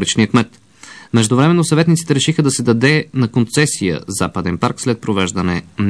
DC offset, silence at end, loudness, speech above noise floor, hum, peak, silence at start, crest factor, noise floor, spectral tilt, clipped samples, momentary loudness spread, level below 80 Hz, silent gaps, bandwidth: 0.2%; 0 s; -15 LUFS; 25 dB; none; 0 dBFS; 0 s; 14 dB; -39 dBFS; -5 dB/octave; under 0.1%; 7 LU; -48 dBFS; none; 11 kHz